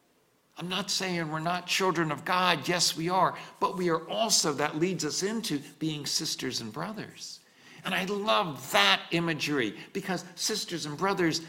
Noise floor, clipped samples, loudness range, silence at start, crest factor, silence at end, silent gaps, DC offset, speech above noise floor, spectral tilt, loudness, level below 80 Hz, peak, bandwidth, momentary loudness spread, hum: -67 dBFS; under 0.1%; 5 LU; 0.55 s; 24 dB; 0 s; none; under 0.1%; 38 dB; -3 dB/octave; -28 LUFS; -70 dBFS; -6 dBFS; 17 kHz; 11 LU; none